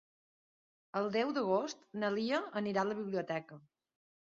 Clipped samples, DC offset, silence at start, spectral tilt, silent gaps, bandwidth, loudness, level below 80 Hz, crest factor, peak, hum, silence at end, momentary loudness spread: under 0.1%; under 0.1%; 0.95 s; -4 dB/octave; none; 7.4 kHz; -36 LUFS; -82 dBFS; 18 dB; -20 dBFS; none; 0.75 s; 8 LU